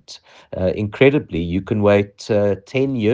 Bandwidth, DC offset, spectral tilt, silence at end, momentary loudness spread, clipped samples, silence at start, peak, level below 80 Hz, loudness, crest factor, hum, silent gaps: 7.8 kHz; under 0.1%; -7.5 dB/octave; 0 s; 8 LU; under 0.1%; 0.1 s; 0 dBFS; -48 dBFS; -18 LUFS; 18 dB; none; none